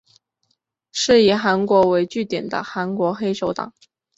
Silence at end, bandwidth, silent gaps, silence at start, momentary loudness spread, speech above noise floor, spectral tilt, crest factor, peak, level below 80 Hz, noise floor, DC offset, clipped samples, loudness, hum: 0.5 s; 8 kHz; none; 0.95 s; 11 LU; 52 dB; -4.5 dB/octave; 18 dB; -4 dBFS; -58 dBFS; -70 dBFS; under 0.1%; under 0.1%; -19 LUFS; none